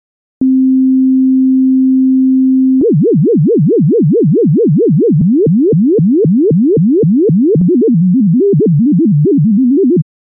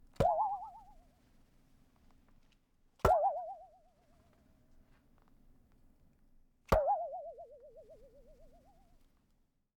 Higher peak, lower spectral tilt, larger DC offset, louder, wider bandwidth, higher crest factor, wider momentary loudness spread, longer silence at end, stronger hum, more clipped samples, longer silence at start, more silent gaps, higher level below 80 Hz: first, -2 dBFS vs -14 dBFS; first, -19 dB/octave vs -6.5 dB/octave; neither; first, -9 LUFS vs -34 LUFS; second, 0.7 kHz vs 19 kHz; second, 6 dB vs 26 dB; second, 0 LU vs 24 LU; second, 0.3 s vs 1.35 s; neither; neither; first, 0.4 s vs 0.2 s; neither; about the same, -50 dBFS vs -52 dBFS